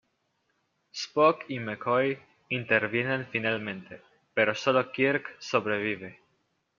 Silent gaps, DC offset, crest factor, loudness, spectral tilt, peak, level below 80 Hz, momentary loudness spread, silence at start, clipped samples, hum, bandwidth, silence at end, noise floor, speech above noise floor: none; under 0.1%; 22 dB; -28 LUFS; -3 dB/octave; -8 dBFS; -76 dBFS; 13 LU; 0.95 s; under 0.1%; none; 7.4 kHz; 0.65 s; -75 dBFS; 47 dB